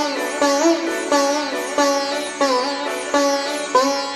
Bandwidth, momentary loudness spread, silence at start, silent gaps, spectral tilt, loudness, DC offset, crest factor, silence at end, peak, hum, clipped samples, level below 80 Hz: 15 kHz; 5 LU; 0 s; none; -1 dB/octave; -19 LUFS; under 0.1%; 16 dB; 0 s; -4 dBFS; none; under 0.1%; -64 dBFS